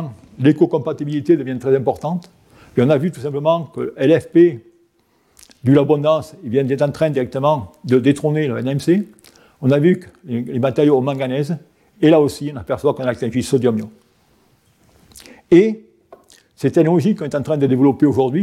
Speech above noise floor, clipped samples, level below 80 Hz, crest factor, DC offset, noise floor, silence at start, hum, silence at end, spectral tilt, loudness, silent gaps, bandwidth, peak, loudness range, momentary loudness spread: 44 dB; under 0.1%; -56 dBFS; 16 dB; under 0.1%; -60 dBFS; 0 s; none; 0 s; -8 dB/octave; -17 LUFS; none; 13.5 kHz; 0 dBFS; 3 LU; 10 LU